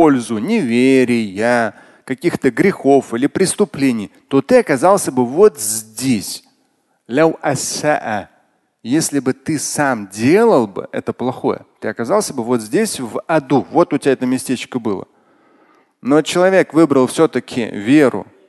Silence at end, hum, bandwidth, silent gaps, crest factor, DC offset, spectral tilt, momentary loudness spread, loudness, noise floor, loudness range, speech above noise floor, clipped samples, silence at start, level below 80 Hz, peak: 0.25 s; none; 12.5 kHz; none; 16 dB; under 0.1%; -5 dB/octave; 10 LU; -16 LUFS; -62 dBFS; 4 LU; 47 dB; under 0.1%; 0 s; -56 dBFS; 0 dBFS